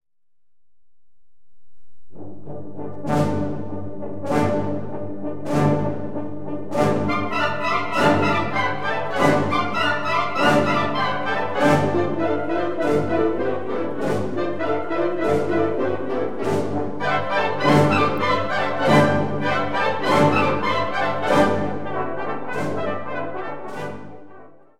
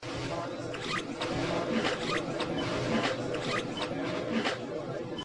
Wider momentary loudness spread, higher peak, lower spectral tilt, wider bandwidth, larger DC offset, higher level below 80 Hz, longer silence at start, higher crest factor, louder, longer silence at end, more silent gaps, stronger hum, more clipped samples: first, 13 LU vs 6 LU; first, -2 dBFS vs -16 dBFS; about the same, -6 dB/octave vs -5 dB/octave; first, 15.5 kHz vs 11.5 kHz; first, 4% vs under 0.1%; about the same, -54 dBFS vs -58 dBFS; about the same, 0 s vs 0 s; about the same, 20 dB vs 16 dB; first, -21 LUFS vs -32 LUFS; about the same, 0 s vs 0 s; neither; neither; neither